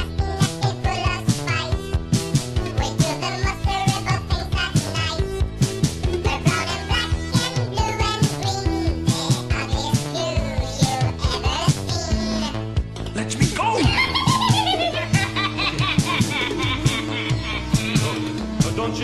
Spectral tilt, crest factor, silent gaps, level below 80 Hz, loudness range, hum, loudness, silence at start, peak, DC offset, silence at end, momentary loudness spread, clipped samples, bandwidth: -4.5 dB/octave; 18 dB; none; -30 dBFS; 3 LU; none; -22 LUFS; 0 s; -4 dBFS; under 0.1%; 0 s; 6 LU; under 0.1%; 13 kHz